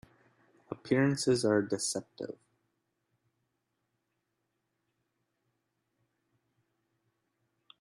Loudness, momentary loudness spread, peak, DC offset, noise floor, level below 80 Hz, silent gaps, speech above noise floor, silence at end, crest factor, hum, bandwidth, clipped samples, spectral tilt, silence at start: -30 LUFS; 18 LU; -16 dBFS; under 0.1%; -82 dBFS; -74 dBFS; none; 52 dB; 5.5 s; 22 dB; none; 13 kHz; under 0.1%; -4.5 dB/octave; 0.7 s